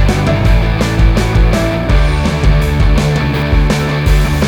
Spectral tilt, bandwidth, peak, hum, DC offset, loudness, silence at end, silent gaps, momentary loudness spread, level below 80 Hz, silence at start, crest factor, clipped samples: -6.5 dB/octave; 15.5 kHz; 0 dBFS; none; under 0.1%; -13 LUFS; 0 s; none; 2 LU; -14 dBFS; 0 s; 10 dB; under 0.1%